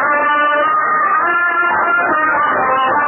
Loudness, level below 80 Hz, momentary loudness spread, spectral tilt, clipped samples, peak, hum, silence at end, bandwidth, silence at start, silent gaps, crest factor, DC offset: -13 LUFS; -56 dBFS; 1 LU; 4 dB/octave; under 0.1%; -4 dBFS; none; 0 s; 3.2 kHz; 0 s; none; 10 dB; under 0.1%